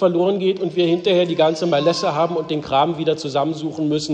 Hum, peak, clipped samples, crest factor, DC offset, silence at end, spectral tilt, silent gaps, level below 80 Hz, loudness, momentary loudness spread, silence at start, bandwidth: none; -4 dBFS; under 0.1%; 14 dB; under 0.1%; 0 s; -6 dB/octave; none; -58 dBFS; -19 LUFS; 5 LU; 0 s; 9.2 kHz